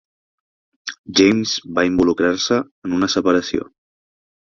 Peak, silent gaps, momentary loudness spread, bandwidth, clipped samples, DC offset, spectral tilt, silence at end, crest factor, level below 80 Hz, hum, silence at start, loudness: -2 dBFS; 0.98-1.04 s, 2.71-2.82 s; 16 LU; 7.2 kHz; under 0.1%; under 0.1%; -4 dB/octave; 0.9 s; 18 dB; -50 dBFS; none; 0.85 s; -18 LUFS